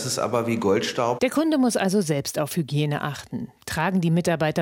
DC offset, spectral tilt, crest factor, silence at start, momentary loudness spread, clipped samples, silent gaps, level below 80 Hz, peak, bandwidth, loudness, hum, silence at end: under 0.1%; -5.5 dB/octave; 14 dB; 0 s; 9 LU; under 0.1%; none; -58 dBFS; -8 dBFS; 17 kHz; -23 LUFS; none; 0 s